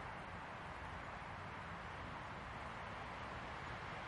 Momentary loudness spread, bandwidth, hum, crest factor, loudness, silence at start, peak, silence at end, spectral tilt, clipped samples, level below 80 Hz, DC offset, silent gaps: 2 LU; 11 kHz; none; 12 dB; -49 LUFS; 0 s; -36 dBFS; 0 s; -5.5 dB/octave; under 0.1%; -62 dBFS; under 0.1%; none